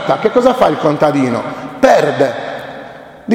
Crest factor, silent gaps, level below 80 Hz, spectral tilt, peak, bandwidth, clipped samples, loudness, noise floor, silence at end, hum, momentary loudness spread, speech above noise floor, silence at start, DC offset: 14 dB; none; -48 dBFS; -6 dB/octave; 0 dBFS; 16 kHz; under 0.1%; -13 LUFS; -33 dBFS; 0 s; none; 19 LU; 21 dB; 0 s; under 0.1%